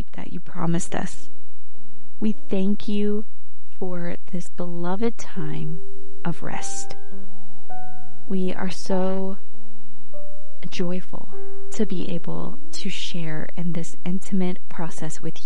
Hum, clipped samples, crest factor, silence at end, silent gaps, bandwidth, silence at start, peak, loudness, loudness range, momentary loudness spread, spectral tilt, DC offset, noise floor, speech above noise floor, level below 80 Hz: none; under 0.1%; 16 dB; 0 s; none; 11.5 kHz; 0 s; -6 dBFS; -29 LUFS; 4 LU; 17 LU; -6 dB/octave; 30%; -52 dBFS; 24 dB; -54 dBFS